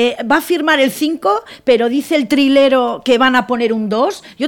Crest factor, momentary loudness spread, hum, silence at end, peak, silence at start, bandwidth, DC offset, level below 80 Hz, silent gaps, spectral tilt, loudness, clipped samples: 12 dB; 6 LU; none; 0 s; -2 dBFS; 0 s; 18 kHz; under 0.1%; -54 dBFS; none; -4 dB/octave; -14 LUFS; under 0.1%